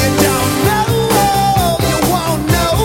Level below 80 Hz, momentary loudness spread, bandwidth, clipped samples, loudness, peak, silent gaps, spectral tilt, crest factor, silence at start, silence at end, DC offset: -28 dBFS; 2 LU; 17 kHz; under 0.1%; -13 LUFS; 0 dBFS; none; -4.5 dB/octave; 12 dB; 0 s; 0 s; under 0.1%